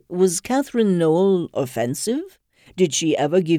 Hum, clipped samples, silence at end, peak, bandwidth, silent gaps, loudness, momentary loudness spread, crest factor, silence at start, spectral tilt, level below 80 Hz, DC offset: none; under 0.1%; 0 s; -6 dBFS; 15.5 kHz; none; -20 LUFS; 8 LU; 14 dB; 0.1 s; -5 dB/octave; -62 dBFS; under 0.1%